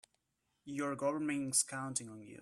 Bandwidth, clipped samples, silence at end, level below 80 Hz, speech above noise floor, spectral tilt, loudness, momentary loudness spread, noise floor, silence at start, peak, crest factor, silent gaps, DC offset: 15 kHz; under 0.1%; 0 s; -80 dBFS; 45 dB; -3 dB/octave; -36 LUFS; 10 LU; -83 dBFS; 0.65 s; -18 dBFS; 20 dB; none; under 0.1%